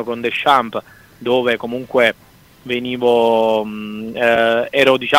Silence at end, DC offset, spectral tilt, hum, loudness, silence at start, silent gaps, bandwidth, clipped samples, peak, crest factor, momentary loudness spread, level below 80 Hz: 0 s; under 0.1%; -4.5 dB/octave; none; -16 LUFS; 0 s; none; 16 kHz; under 0.1%; 0 dBFS; 16 dB; 13 LU; -56 dBFS